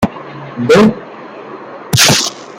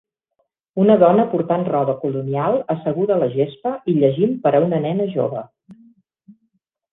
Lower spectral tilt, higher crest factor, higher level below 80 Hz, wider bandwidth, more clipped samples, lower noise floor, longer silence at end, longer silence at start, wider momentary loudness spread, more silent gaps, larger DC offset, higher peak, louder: second, -3.5 dB/octave vs -11 dB/octave; about the same, 14 dB vs 18 dB; first, -44 dBFS vs -60 dBFS; first, 18 kHz vs 4 kHz; neither; second, -30 dBFS vs -71 dBFS; second, 0.05 s vs 1.2 s; second, 0 s vs 0.75 s; first, 22 LU vs 9 LU; neither; neither; about the same, 0 dBFS vs -2 dBFS; first, -10 LUFS vs -18 LUFS